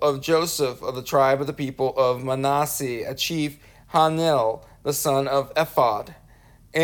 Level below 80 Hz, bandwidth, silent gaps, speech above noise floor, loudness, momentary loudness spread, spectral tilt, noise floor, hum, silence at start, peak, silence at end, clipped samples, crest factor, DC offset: -54 dBFS; over 20 kHz; none; 29 dB; -23 LUFS; 9 LU; -4.5 dB/octave; -51 dBFS; none; 0 s; -4 dBFS; 0 s; under 0.1%; 18 dB; under 0.1%